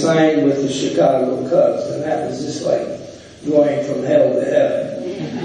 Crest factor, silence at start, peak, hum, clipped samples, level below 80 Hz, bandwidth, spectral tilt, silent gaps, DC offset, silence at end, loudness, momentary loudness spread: 14 dB; 0 s; -4 dBFS; none; under 0.1%; -56 dBFS; 9.8 kHz; -6 dB/octave; none; under 0.1%; 0 s; -17 LUFS; 11 LU